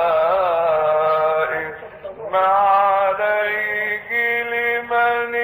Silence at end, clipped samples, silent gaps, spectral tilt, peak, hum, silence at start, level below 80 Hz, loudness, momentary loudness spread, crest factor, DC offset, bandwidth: 0 s; under 0.1%; none; -5.5 dB/octave; -6 dBFS; none; 0 s; -58 dBFS; -18 LUFS; 8 LU; 12 dB; under 0.1%; 15.5 kHz